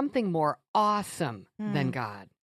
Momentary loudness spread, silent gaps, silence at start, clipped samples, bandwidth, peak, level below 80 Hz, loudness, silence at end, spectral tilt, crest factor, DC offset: 10 LU; 0.68-0.74 s; 0 s; under 0.1%; 15 kHz; -12 dBFS; -70 dBFS; -30 LUFS; 0.2 s; -6 dB/octave; 16 dB; under 0.1%